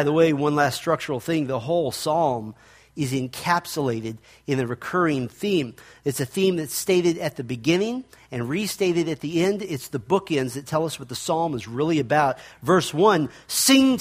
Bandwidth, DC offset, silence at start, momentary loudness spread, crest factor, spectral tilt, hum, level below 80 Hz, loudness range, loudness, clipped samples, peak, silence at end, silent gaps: 15.5 kHz; under 0.1%; 0 s; 11 LU; 18 dB; -4.5 dB/octave; none; -60 dBFS; 3 LU; -23 LUFS; under 0.1%; -4 dBFS; 0 s; none